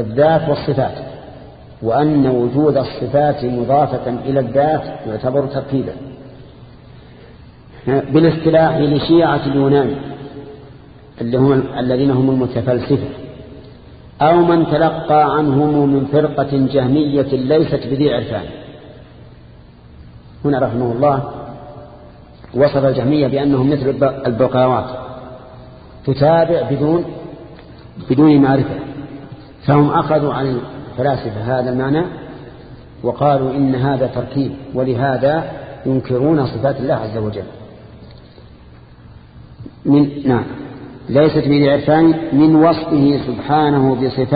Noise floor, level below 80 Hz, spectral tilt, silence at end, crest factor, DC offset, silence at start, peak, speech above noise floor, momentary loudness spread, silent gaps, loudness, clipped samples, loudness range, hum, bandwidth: -41 dBFS; -42 dBFS; -12.5 dB/octave; 0 s; 16 dB; under 0.1%; 0 s; 0 dBFS; 26 dB; 19 LU; none; -15 LUFS; under 0.1%; 7 LU; none; 5 kHz